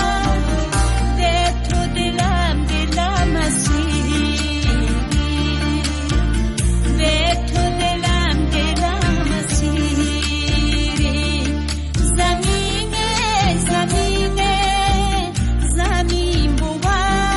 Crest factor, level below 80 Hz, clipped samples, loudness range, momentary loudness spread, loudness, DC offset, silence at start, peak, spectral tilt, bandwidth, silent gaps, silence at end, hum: 12 dB; -20 dBFS; under 0.1%; 1 LU; 3 LU; -18 LUFS; under 0.1%; 0 s; -6 dBFS; -4.5 dB/octave; 11.5 kHz; none; 0 s; none